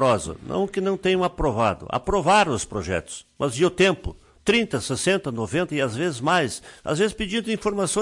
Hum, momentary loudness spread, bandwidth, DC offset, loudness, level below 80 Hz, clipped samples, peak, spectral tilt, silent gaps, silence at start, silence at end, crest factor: none; 9 LU; 11.5 kHz; under 0.1%; -23 LUFS; -44 dBFS; under 0.1%; -8 dBFS; -4.5 dB/octave; none; 0 s; 0 s; 16 dB